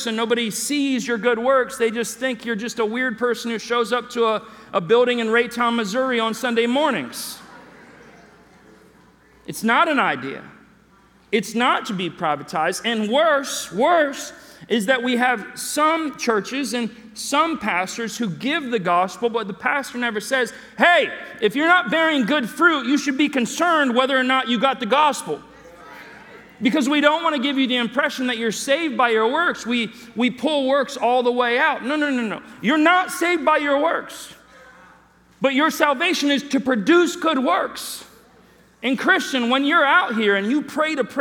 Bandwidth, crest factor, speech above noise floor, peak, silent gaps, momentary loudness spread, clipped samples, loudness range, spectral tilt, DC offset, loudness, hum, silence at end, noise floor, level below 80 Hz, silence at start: 19 kHz; 20 dB; 33 dB; 0 dBFS; none; 9 LU; under 0.1%; 4 LU; -3.5 dB/octave; under 0.1%; -20 LUFS; none; 0 s; -54 dBFS; -64 dBFS; 0 s